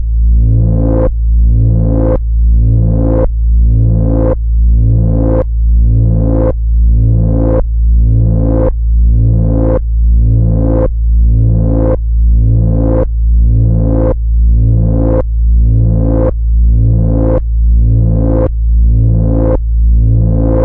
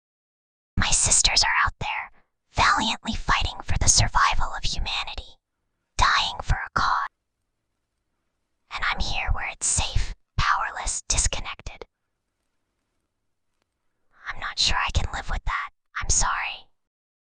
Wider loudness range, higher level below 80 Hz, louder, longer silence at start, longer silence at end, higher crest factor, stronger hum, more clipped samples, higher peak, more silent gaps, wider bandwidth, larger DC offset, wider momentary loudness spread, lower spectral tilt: second, 0 LU vs 8 LU; first, -10 dBFS vs -32 dBFS; first, -11 LUFS vs -23 LUFS; second, 0 s vs 0.75 s; second, 0 s vs 0.65 s; second, 6 dB vs 22 dB; neither; neither; about the same, -2 dBFS vs -4 dBFS; neither; second, 1.8 kHz vs 12 kHz; neither; second, 3 LU vs 16 LU; first, -14.5 dB/octave vs -1 dB/octave